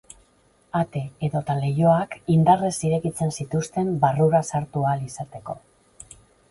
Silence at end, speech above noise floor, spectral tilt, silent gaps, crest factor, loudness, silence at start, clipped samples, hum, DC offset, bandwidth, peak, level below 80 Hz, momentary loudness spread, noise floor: 0.45 s; 38 dB; -7 dB/octave; none; 18 dB; -23 LUFS; 0.75 s; under 0.1%; none; under 0.1%; 11.5 kHz; -4 dBFS; -56 dBFS; 15 LU; -60 dBFS